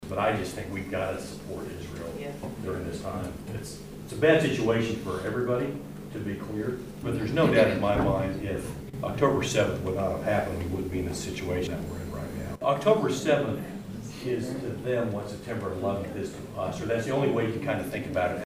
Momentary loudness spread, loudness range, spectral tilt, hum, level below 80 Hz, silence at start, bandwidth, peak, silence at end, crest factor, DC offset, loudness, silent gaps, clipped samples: 13 LU; 6 LU; -6 dB/octave; none; -48 dBFS; 0 s; 15.5 kHz; -8 dBFS; 0 s; 20 dB; under 0.1%; -29 LUFS; none; under 0.1%